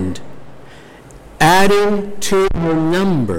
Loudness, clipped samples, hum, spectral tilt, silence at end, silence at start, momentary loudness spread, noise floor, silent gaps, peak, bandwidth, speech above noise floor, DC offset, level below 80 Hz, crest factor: -15 LUFS; under 0.1%; none; -5 dB/octave; 0 s; 0 s; 9 LU; -38 dBFS; none; -2 dBFS; 16.5 kHz; 25 dB; under 0.1%; -34 dBFS; 14 dB